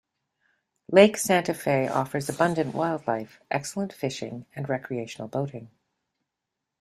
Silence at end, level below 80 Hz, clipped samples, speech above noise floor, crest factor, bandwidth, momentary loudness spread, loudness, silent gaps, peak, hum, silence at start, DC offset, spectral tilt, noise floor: 1.15 s; -66 dBFS; under 0.1%; 59 dB; 24 dB; 15 kHz; 15 LU; -26 LUFS; none; -2 dBFS; none; 0.9 s; under 0.1%; -5 dB/octave; -85 dBFS